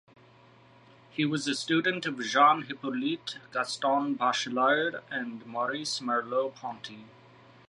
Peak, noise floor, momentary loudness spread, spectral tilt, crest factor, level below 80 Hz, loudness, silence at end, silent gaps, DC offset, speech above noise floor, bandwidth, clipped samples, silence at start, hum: -10 dBFS; -57 dBFS; 13 LU; -3.5 dB/octave; 20 dB; -80 dBFS; -29 LUFS; 0.6 s; none; under 0.1%; 28 dB; 11.5 kHz; under 0.1%; 1.15 s; none